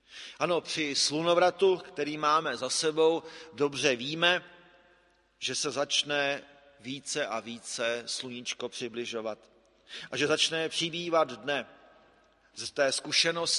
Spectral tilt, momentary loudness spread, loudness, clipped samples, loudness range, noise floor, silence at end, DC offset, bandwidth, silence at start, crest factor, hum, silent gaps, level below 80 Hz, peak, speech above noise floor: -2 dB/octave; 13 LU; -29 LUFS; under 0.1%; 7 LU; -66 dBFS; 0 s; under 0.1%; 11.5 kHz; 0.1 s; 22 dB; none; none; -74 dBFS; -8 dBFS; 36 dB